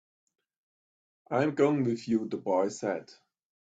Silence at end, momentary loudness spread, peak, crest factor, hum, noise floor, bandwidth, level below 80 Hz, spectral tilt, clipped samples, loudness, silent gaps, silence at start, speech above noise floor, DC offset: 0.6 s; 8 LU; -12 dBFS; 20 dB; none; under -90 dBFS; 8.4 kHz; -74 dBFS; -6.5 dB/octave; under 0.1%; -29 LUFS; none; 1.3 s; over 61 dB; under 0.1%